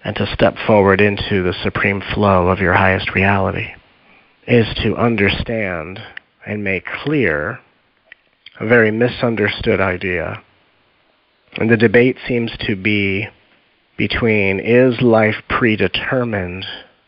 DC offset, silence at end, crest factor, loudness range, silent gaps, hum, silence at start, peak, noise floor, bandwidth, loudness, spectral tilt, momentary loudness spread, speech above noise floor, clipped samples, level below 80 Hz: under 0.1%; 0.25 s; 16 dB; 4 LU; none; none; 0.05 s; 0 dBFS; -58 dBFS; 5.6 kHz; -16 LUFS; -4.5 dB/octave; 14 LU; 43 dB; under 0.1%; -40 dBFS